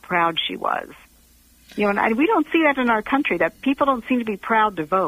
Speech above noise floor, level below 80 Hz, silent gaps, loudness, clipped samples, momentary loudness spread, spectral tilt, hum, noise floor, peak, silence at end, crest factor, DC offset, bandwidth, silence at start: 33 dB; -54 dBFS; none; -20 LUFS; under 0.1%; 6 LU; -5.5 dB/octave; 60 Hz at -45 dBFS; -54 dBFS; -6 dBFS; 0 s; 14 dB; under 0.1%; 15.5 kHz; 0.1 s